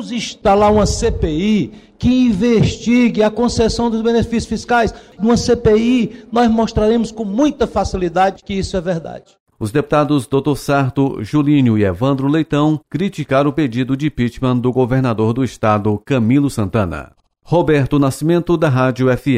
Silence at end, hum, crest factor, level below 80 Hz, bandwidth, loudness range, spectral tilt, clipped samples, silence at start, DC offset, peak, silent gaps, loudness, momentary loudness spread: 0 s; none; 12 dB; -34 dBFS; 15 kHz; 3 LU; -6.5 dB/octave; under 0.1%; 0 s; under 0.1%; -2 dBFS; 9.40-9.46 s; -16 LUFS; 7 LU